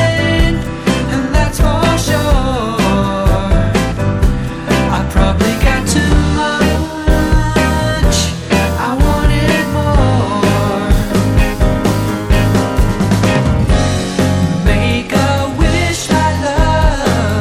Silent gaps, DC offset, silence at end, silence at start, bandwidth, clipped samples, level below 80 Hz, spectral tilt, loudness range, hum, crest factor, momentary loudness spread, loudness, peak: none; under 0.1%; 0 s; 0 s; 16.5 kHz; under 0.1%; -18 dBFS; -5.5 dB/octave; 1 LU; none; 12 dB; 3 LU; -13 LUFS; 0 dBFS